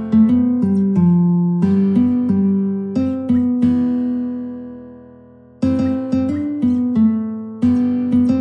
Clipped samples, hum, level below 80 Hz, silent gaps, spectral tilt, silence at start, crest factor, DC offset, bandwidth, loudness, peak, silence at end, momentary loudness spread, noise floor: under 0.1%; none; -50 dBFS; none; -10.5 dB/octave; 0 s; 12 dB; under 0.1%; 5.8 kHz; -17 LUFS; -4 dBFS; 0 s; 8 LU; -43 dBFS